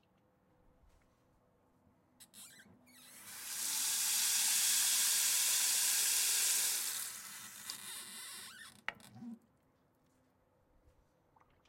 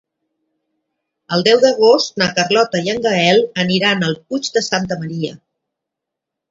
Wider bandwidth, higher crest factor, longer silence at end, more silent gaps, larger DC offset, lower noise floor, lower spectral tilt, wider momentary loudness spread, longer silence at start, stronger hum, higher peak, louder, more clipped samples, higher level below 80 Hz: first, 16.5 kHz vs 7.8 kHz; about the same, 20 dB vs 18 dB; first, 2.35 s vs 1.15 s; neither; neither; second, -74 dBFS vs -81 dBFS; second, 2.5 dB/octave vs -4 dB/octave; first, 20 LU vs 10 LU; first, 2.2 s vs 1.3 s; neither; second, -18 dBFS vs 0 dBFS; second, -31 LUFS vs -15 LUFS; neither; second, -80 dBFS vs -58 dBFS